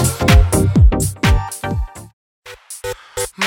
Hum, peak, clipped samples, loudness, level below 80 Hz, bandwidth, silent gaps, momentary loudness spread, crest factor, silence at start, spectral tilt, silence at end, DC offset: none; 0 dBFS; under 0.1%; -15 LUFS; -18 dBFS; 17 kHz; 2.13-2.42 s; 16 LU; 14 dB; 0 s; -5 dB/octave; 0 s; under 0.1%